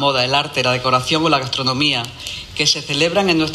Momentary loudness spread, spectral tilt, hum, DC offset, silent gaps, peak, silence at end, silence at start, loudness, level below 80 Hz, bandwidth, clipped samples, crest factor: 6 LU; -3.5 dB/octave; none; under 0.1%; none; -4 dBFS; 0 s; 0 s; -16 LUFS; -46 dBFS; 14 kHz; under 0.1%; 14 dB